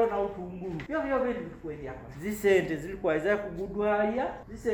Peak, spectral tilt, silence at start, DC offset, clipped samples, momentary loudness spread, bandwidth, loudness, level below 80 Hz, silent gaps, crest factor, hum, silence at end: -12 dBFS; -6 dB/octave; 0 s; under 0.1%; under 0.1%; 14 LU; over 20 kHz; -30 LUFS; -52 dBFS; none; 18 dB; none; 0 s